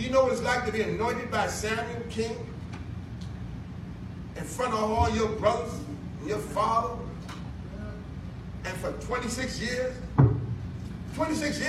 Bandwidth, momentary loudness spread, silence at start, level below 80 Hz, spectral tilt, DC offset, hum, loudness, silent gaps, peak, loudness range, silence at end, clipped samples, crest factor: 14.5 kHz; 14 LU; 0 s; -44 dBFS; -5.5 dB/octave; under 0.1%; none; -30 LUFS; none; -6 dBFS; 5 LU; 0 s; under 0.1%; 24 dB